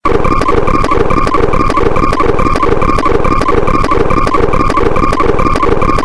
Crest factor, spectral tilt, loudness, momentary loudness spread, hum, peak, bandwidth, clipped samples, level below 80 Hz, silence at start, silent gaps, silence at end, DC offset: 8 dB; -6.5 dB/octave; -11 LUFS; 1 LU; none; 0 dBFS; 11 kHz; 0.2%; -16 dBFS; 0.05 s; none; 0 s; 1%